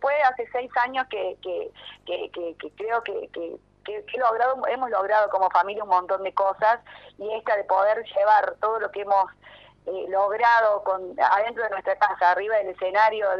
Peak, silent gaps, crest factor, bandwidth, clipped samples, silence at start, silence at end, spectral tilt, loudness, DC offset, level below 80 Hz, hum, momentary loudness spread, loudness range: -6 dBFS; none; 18 dB; 6.8 kHz; under 0.1%; 0 s; 0 s; -4.5 dB/octave; -24 LUFS; under 0.1%; -66 dBFS; 50 Hz at -65 dBFS; 14 LU; 7 LU